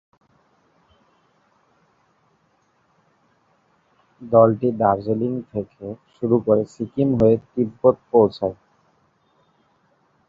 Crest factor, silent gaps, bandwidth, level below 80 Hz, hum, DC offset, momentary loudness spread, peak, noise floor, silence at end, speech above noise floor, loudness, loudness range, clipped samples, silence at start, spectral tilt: 20 dB; none; 7.6 kHz; -54 dBFS; none; under 0.1%; 14 LU; -2 dBFS; -64 dBFS; 1.75 s; 45 dB; -20 LUFS; 3 LU; under 0.1%; 4.2 s; -10 dB/octave